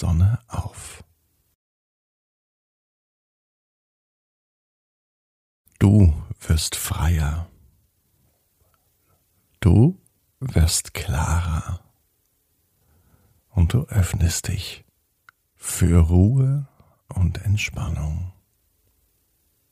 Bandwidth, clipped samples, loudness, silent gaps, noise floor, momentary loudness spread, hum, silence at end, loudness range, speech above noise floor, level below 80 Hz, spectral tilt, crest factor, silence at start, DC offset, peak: 15.5 kHz; under 0.1%; -21 LUFS; 1.55-5.65 s; -68 dBFS; 17 LU; none; 1.4 s; 5 LU; 48 dB; -32 dBFS; -5.5 dB/octave; 20 dB; 0 s; under 0.1%; -2 dBFS